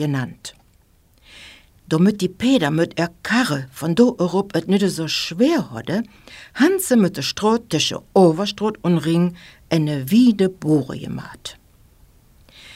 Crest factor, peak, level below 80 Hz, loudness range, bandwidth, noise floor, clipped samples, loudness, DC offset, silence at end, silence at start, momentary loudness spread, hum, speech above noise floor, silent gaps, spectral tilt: 18 dB; -2 dBFS; -54 dBFS; 3 LU; 16 kHz; -55 dBFS; under 0.1%; -19 LUFS; under 0.1%; 0 s; 0 s; 14 LU; none; 37 dB; none; -5.5 dB/octave